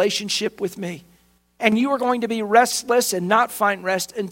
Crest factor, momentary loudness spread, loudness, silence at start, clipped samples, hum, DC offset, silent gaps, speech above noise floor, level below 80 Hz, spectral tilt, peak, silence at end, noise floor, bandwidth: 20 dB; 11 LU; -20 LUFS; 0 s; under 0.1%; none; under 0.1%; none; 38 dB; -64 dBFS; -3 dB/octave; 0 dBFS; 0 s; -58 dBFS; 16.5 kHz